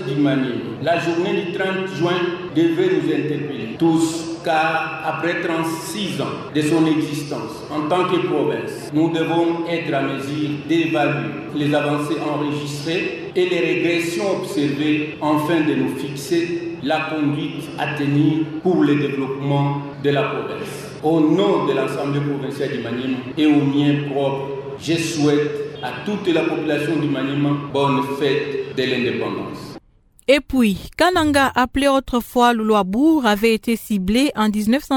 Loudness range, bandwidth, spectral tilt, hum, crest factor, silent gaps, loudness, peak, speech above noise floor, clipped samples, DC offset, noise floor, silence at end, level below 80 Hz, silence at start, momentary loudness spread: 4 LU; 17 kHz; -6 dB/octave; none; 20 dB; none; -20 LUFS; 0 dBFS; 29 dB; under 0.1%; under 0.1%; -48 dBFS; 0 s; -48 dBFS; 0 s; 8 LU